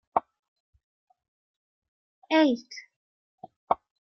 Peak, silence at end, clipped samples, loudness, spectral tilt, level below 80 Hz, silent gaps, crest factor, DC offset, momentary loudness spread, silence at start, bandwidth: -8 dBFS; 0.35 s; under 0.1%; -27 LUFS; -4.5 dB/octave; -74 dBFS; 0.39-0.73 s, 0.83-1.07 s, 1.28-1.82 s, 1.88-2.22 s, 2.96-3.38 s, 3.56-3.67 s; 24 dB; under 0.1%; 19 LU; 0.15 s; 6.4 kHz